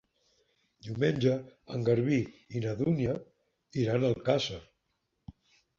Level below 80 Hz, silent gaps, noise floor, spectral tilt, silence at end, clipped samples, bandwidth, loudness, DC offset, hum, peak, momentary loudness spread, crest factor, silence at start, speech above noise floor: -60 dBFS; none; -80 dBFS; -7 dB/octave; 0.45 s; under 0.1%; 7.4 kHz; -31 LUFS; under 0.1%; none; -12 dBFS; 12 LU; 20 dB; 0.85 s; 50 dB